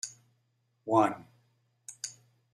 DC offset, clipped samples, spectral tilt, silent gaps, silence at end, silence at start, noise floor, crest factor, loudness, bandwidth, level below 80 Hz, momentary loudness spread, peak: under 0.1%; under 0.1%; -4.5 dB/octave; none; 0.45 s; 0.05 s; -75 dBFS; 24 dB; -31 LUFS; 14.5 kHz; -82 dBFS; 22 LU; -10 dBFS